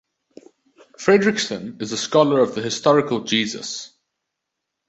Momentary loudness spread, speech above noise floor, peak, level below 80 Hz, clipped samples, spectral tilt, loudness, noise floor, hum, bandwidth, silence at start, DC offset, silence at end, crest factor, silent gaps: 12 LU; 61 dB; -2 dBFS; -64 dBFS; under 0.1%; -4 dB/octave; -20 LUFS; -80 dBFS; none; 8.2 kHz; 1 s; under 0.1%; 1 s; 20 dB; none